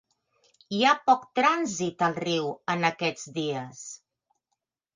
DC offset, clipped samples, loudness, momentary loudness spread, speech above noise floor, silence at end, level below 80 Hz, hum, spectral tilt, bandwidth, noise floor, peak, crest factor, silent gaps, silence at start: under 0.1%; under 0.1%; -26 LUFS; 15 LU; 56 dB; 1 s; -74 dBFS; none; -4 dB/octave; 9.8 kHz; -82 dBFS; -8 dBFS; 20 dB; none; 0.7 s